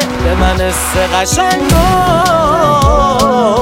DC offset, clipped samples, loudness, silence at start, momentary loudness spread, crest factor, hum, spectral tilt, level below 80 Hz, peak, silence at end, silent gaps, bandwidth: under 0.1%; under 0.1%; -10 LUFS; 0 s; 3 LU; 10 dB; none; -4.5 dB/octave; -20 dBFS; 0 dBFS; 0 s; none; 16.5 kHz